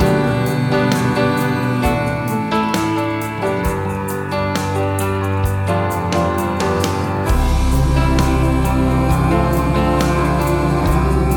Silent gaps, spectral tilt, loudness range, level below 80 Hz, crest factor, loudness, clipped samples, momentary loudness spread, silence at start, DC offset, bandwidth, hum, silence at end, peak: none; -6.5 dB/octave; 3 LU; -24 dBFS; 14 dB; -17 LUFS; under 0.1%; 4 LU; 0 s; under 0.1%; 19 kHz; none; 0 s; -2 dBFS